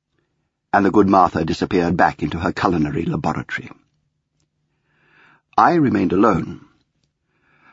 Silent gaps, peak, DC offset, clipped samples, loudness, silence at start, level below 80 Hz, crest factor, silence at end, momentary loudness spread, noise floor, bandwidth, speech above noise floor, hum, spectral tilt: none; 0 dBFS; under 0.1%; under 0.1%; -18 LUFS; 0.75 s; -46 dBFS; 18 dB; 1.15 s; 10 LU; -71 dBFS; 8 kHz; 54 dB; none; -7.5 dB/octave